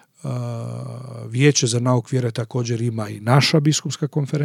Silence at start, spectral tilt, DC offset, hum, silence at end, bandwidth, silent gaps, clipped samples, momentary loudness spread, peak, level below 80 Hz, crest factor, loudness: 0.25 s; -5 dB/octave; under 0.1%; none; 0 s; 14.5 kHz; none; under 0.1%; 14 LU; 0 dBFS; -76 dBFS; 20 dB; -20 LUFS